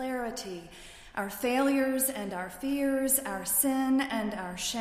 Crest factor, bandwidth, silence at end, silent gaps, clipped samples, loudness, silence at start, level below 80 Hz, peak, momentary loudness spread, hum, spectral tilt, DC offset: 18 dB; 15.5 kHz; 0 s; none; under 0.1%; -29 LUFS; 0 s; -58 dBFS; -12 dBFS; 14 LU; none; -3 dB/octave; under 0.1%